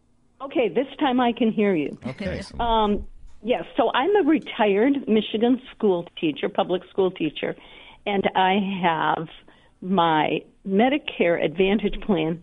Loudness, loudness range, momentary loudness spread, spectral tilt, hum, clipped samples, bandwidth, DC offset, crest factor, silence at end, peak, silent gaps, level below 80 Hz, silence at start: -23 LUFS; 2 LU; 10 LU; -7.5 dB/octave; none; under 0.1%; 10 kHz; under 0.1%; 18 dB; 0 s; -6 dBFS; none; -44 dBFS; 0.4 s